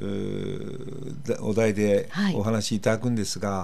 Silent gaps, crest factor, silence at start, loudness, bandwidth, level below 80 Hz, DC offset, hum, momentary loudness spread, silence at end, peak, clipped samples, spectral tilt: none; 20 dB; 0 s; -26 LUFS; 14.5 kHz; -58 dBFS; 2%; none; 12 LU; 0 s; -6 dBFS; under 0.1%; -5.5 dB/octave